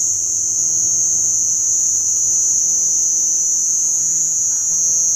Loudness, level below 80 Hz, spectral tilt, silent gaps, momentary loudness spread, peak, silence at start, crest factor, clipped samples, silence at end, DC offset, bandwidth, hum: -13 LUFS; -56 dBFS; 1 dB/octave; none; 2 LU; -4 dBFS; 0 s; 12 dB; under 0.1%; 0 s; under 0.1%; 16.5 kHz; none